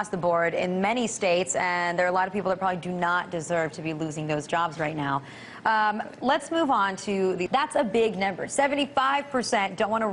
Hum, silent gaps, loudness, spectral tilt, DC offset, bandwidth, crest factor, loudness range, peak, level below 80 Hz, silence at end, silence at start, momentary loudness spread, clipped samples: none; none; -26 LUFS; -4 dB/octave; under 0.1%; 11 kHz; 18 dB; 3 LU; -8 dBFS; -62 dBFS; 0 s; 0 s; 5 LU; under 0.1%